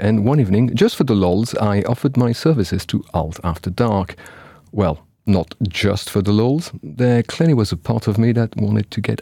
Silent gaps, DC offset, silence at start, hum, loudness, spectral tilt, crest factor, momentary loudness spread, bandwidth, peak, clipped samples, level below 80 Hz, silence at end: none; under 0.1%; 0 s; none; -18 LUFS; -7 dB/octave; 14 dB; 8 LU; 16.5 kHz; -2 dBFS; under 0.1%; -42 dBFS; 0 s